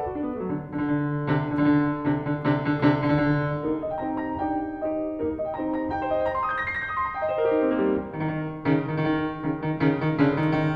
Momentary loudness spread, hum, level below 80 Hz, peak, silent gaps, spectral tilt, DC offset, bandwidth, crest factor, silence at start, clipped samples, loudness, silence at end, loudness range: 7 LU; none; -50 dBFS; -6 dBFS; none; -9.5 dB/octave; under 0.1%; 5 kHz; 18 dB; 0 s; under 0.1%; -25 LUFS; 0 s; 3 LU